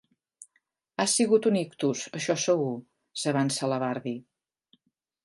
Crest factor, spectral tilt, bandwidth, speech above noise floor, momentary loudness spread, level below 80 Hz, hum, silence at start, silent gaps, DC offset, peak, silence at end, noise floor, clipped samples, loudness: 18 dB; -4 dB/octave; 11.5 kHz; 47 dB; 16 LU; -78 dBFS; none; 0.4 s; none; under 0.1%; -10 dBFS; 1.05 s; -74 dBFS; under 0.1%; -27 LUFS